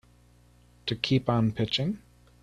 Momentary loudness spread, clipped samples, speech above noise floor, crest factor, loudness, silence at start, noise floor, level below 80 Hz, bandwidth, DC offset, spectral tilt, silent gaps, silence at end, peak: 11 LU; under 0.1%; 32 dB; 22 dB; -28 LUFS; 0.85 s; -59 dBFS; -56 dBFS; 10 kHz; under 0.1%; -6.5 dB/octave; none; 0.45 s; -8 dBFS